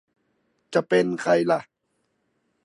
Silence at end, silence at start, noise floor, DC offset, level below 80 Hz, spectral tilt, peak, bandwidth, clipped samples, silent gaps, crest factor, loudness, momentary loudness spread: 1.05 s; 0.7 s; -73 dBFS; under 0.1%; -76 dBFS; -6 dB/octave; -6 dBFS; 11.5 kHz; under 0.1%; none; 20 dB; -23 LUFS; 6 LU